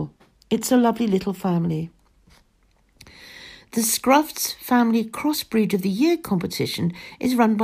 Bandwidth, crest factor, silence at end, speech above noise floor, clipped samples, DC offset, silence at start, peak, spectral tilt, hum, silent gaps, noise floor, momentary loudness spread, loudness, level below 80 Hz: 15.5 kHz; 18 dB; 0 s; 40 dB; under 0.1%; under 0.1%; 0 s; -4 dBFS; -5 dB/octave; none; none; -61 dBFS; 11 LU; -22 LUFS; -58 dBFS